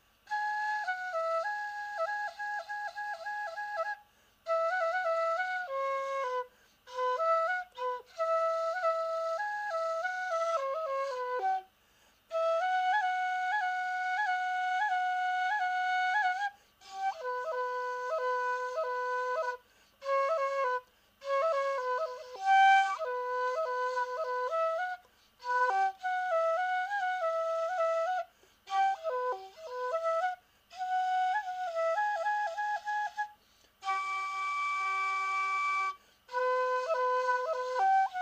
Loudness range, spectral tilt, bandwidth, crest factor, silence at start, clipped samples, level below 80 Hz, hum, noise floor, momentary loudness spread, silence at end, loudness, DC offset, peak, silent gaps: 5 LU; 0 dB/octave; 15.5 kHz; 16 dB; 0.3 s; under 0.1%; -78 dBFS; 50 Hz at -80 dBFS; -66 dBFS; 8 LU; 0 s; -32 LUFS; under 0.1%; -16 dBFS; none